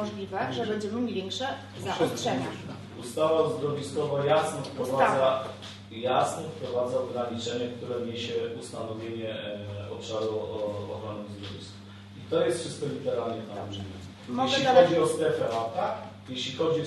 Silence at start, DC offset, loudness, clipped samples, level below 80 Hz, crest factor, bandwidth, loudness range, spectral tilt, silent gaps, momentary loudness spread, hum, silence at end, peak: 0 s; under 0.1%; -29 LUFS; under 0.1%; -60 dBFS; 22 dB; 12.5 kHz; 7 LU; -5 dB/octave; none; 14 LU; none; 0 s; -6 dBFS